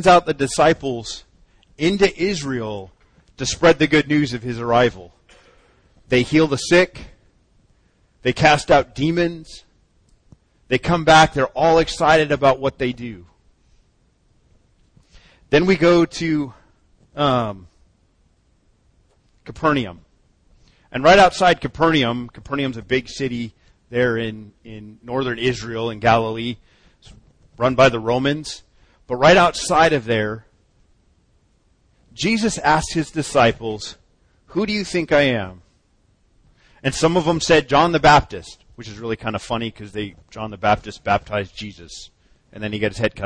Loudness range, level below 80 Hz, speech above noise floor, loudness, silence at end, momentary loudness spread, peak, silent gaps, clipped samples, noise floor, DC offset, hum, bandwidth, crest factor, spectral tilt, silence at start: 7 LU; -44 dBFS; 42 dB; -18 LUFS; 0 s; 18 LU; -2 dBFS; none; under 0.1%; -60 dBFS; under 0.1%; none; 10.5 kHz; 18 dB; -5 dB/octave; 0 s